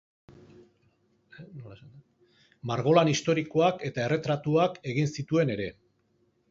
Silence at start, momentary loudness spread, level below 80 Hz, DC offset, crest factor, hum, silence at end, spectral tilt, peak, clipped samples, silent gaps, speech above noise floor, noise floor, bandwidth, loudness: 0.3 s; 23 LU; -64 dBFS; under 0.1%; 22 dB; none; 0.8 s; -6 dB/octave; -8 dBFS; under 0.1%; none; 43 dB; -70 dBFS; 7.8 kHz; -27 LUFS